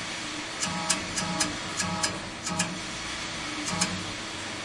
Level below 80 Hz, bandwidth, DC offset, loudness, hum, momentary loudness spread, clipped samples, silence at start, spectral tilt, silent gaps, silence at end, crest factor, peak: -54 dBFS; 11.5 kHz; under 0.1%; -29 LUFS; none; 6 LU; under 0.1%; 0 s; -2 dB/octave; none; 0 s; 22 dB; -8 dBFS